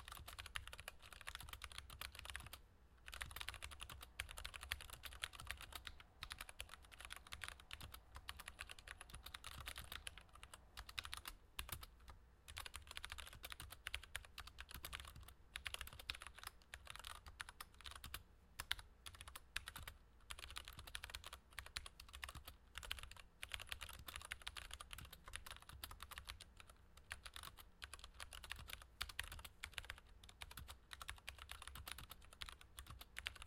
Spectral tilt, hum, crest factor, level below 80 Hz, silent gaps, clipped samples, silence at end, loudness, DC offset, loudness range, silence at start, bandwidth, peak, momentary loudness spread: -1.5 dB/octave; none; 36 dB; -62 dBFS; none; under 0.1%; 0 s; -53 LUFS; under 0.1%; 3 LU; 0 s; 16.5 kHz; -20 dBFS; 8 LU